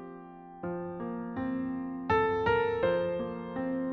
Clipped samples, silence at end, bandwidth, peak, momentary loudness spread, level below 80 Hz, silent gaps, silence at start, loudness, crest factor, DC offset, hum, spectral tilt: under 0.1%; 0 s; 6.2 kHz; -14 dBFS; 13 LU; -56 dBFS; none; 0 s; -32 LUFS; 18 dB; under 0.1%; none; -5 dB/octave